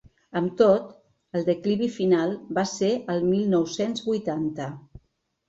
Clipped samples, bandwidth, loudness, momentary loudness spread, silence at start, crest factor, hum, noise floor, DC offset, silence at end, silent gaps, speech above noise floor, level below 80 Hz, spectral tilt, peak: under 0.1%; 8 kHz; -25 LUFS; 12 LU; 0.35 s; 18 dB; none; -69 dBFS; under 0.1%; 0.7 s; none; 45 dB; -60 dBFS; -6 dB/octave; -6 dBFS